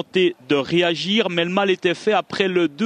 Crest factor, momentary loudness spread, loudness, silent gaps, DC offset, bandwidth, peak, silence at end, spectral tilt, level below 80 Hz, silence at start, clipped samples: 18 dB; 2 LU; -20 LUFS; none; under 0.1%; 10 kHz; -2 dBFS; 0 s; -5 dB/octave; -64 dBFS; 0 s; under 0.1%